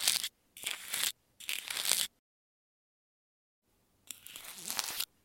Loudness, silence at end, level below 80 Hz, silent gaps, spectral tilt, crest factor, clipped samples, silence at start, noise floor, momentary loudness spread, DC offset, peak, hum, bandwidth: -35 LUFS; 0.2 s; -78 dBFS; 2.19-3.62 s; 2.5 dB/octave; 32 dB; under 0.1%; 0 s; under -90 dBFS; 15 LU; under 0.1%; -6 dBFS; none; 17 kHz